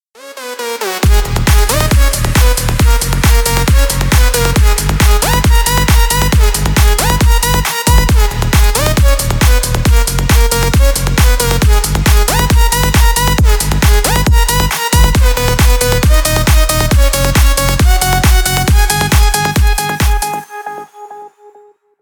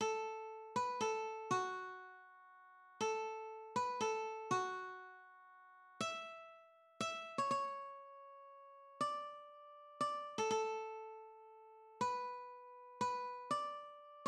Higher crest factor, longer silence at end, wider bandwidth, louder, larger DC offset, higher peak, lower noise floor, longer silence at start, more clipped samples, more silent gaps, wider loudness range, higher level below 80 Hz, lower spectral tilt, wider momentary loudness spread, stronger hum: second, 10 dB vs 18 dB; first, 0.75 s vs 0 s; first, over 20 kHz vs 12.5 kHz; first, -11 LUFS vs -42 LUFS; neither; first, 0 dBFS vs -26 dBFS; second, -44 dBFS vs -64 dBFS; first, 0.25 s vs 0 s; neither; neither; about the same, 1 LU vs 2 LU; first, -12 dBFS vs -90 dBFS; about the same, -4 dB/octave vs -3 dB/octave; second, 3 LU vs 21 LU; neither